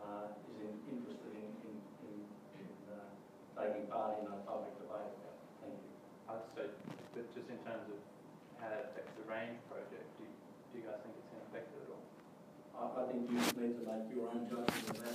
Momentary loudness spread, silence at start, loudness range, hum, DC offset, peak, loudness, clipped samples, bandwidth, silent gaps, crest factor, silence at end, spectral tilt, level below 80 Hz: 15 LU; 0 s; 8 LU; none; under 0.1%; -14 dBFS; -46 LUFS; under 0.1%; 15.5 kHz; none; 32 dB; 0 s; -4.5 dB/octave; -86 dBFS